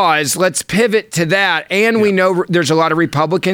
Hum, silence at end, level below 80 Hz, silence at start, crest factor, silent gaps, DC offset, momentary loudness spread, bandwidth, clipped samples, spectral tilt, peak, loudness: none; 0 s; -54 dBFS; 0 s; 14 dB; none; under 0.1%; 3 LU; 20 kHz; under 0.1%; -4 dB/octave; 0 dBFS; -14 LUFS